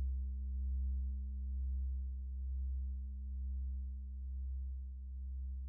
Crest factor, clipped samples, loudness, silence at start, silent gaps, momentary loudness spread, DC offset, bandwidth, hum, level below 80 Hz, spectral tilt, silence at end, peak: 8 dB; under 0.1%; -44 LUFS; 0 s; none; 6 LU; under 0.1%; 0.4 kHz; none; -40 dBFS; -23 dB/octave; 0 s; -32 dBFS